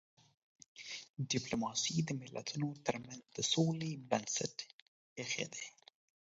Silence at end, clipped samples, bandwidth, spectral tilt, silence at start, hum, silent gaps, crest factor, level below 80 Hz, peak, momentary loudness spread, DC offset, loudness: 0.6 s; under 0.1%; 7.6 kHz; -4 dB/octave; 0.75 s; none; 1.10-1.14 s, 4.73-5.16 s; 24 dB; -74 dBFS; -16 dBFS; 14 LU; under 0.1%; -38 LUFS